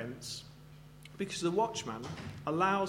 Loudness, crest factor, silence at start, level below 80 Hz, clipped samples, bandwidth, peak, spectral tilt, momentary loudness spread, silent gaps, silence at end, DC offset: -36 LUFS; 20 dB; 0 s; -64 dBFS; under 0.1%; 16.5 kHz; -16 dBFS; -4.5 dB/octave; 21 LU; none; 0 s; under 0.1%